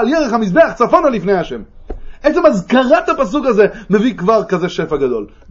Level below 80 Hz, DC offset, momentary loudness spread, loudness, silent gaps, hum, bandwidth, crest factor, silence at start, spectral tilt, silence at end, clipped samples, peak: -36 dBFS; under 0.1%; 11 LU; -14 LUFS; none; none; 7.8 kHz; 14 dB; 0 s; -6.5 dB/octave; 0.25 s; under 0.1%; 0 dBFS